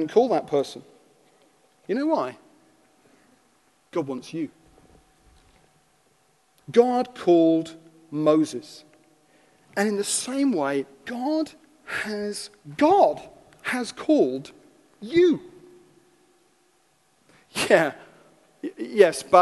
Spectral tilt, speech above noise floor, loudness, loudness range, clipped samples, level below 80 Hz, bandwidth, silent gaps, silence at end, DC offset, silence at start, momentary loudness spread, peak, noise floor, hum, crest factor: -4.5 dB/octave; 42 dB; -24 LUFS; 9 LU; under 0.1%; -66 dBFS; 12.5 kHz; none; 0 s; under 0.1%; 0 s; 16 LU; -2 dBFS; -65 dBFS; none; 24 dB